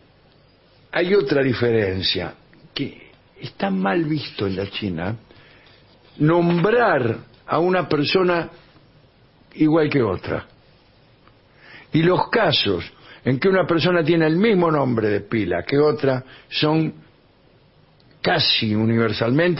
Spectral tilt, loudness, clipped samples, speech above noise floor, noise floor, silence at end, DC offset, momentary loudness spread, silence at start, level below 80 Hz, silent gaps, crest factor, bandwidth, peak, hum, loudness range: -10 dB/octave; -20 LUFS; under 0.1%; 35 dB; -54 dBFS; 0 s; under 0.1%; 11 LU; 0.95 s; -54 dBFS; none; 16 dB; 5.8 kHz; -4 dBFS; none; 6 LU